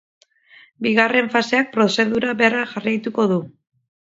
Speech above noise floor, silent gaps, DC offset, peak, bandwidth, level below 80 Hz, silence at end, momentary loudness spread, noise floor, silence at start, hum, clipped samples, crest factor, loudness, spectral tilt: 32 dB; none; under 0.1%; 0 dBFS; 7.8 kHz; -62 dBFS; 0.7 s; 7 LU; -51 dBFS; 0.8 s; none; under 0.1%; 20 dB; -18 LUFS; -5 dB/octave